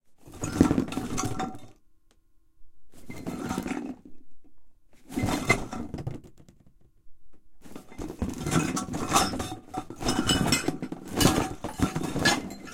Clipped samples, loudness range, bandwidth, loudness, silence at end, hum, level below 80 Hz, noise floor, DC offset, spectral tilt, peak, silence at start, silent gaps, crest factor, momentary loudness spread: under 0.1%; 11 LU; 17 kHz; -28 LUFS; 0 s; none; -44 dBFS; -60 dBFS; under 0.1%; -4 dB/octave; -2 dBFS; 0.1 s; none; 28 dB; 17 LU